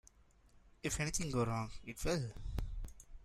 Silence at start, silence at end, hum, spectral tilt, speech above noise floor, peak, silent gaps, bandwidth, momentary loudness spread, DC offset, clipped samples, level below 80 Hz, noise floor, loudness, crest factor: 0.55 s; 0 s; none; -4.5 dB/octave; 28 dB; -24 dBFS; none; 15.5 kHz; 11 LU; under 0.1%; under 0.1%; -48 dBFS; -66 dBFS; -40 LUFS; 18 dB